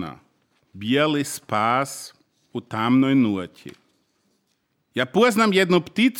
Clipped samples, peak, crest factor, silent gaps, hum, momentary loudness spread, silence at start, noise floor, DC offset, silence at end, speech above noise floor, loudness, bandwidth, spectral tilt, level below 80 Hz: under 0.1%; -6 dBFS; 18 dB; none; none; 18 LU; 0 s; -71 dBFS; under 0.1%; 0 s; 50 dB; -21 LUFS; 17 kHz; -5 dB/octave; -68 dBFS